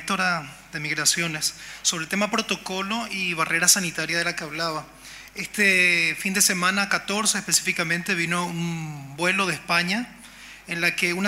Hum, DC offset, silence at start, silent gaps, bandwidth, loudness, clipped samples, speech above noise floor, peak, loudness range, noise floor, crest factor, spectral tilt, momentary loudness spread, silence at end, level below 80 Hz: none; under 0.1%; 0 s; none; 16 kHz; -22 LUFS; under 0.1%; 20 dB; -4 dBFS; 4 LU; -44 dBFS; 20 dB; -2 dB/octave; 15 LU; 0 s; -60 dBFS